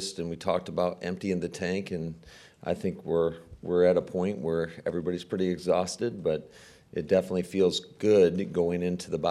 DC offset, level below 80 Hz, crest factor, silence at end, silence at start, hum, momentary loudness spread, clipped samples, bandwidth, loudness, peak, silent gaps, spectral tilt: under 0.1%; -60 dBFS; 16 dB; 0 s; 0 s; none; 11 LU; under 0.1%; 13 kHz; -28 LUFS; -12 dBFS; none; -6 dB/octave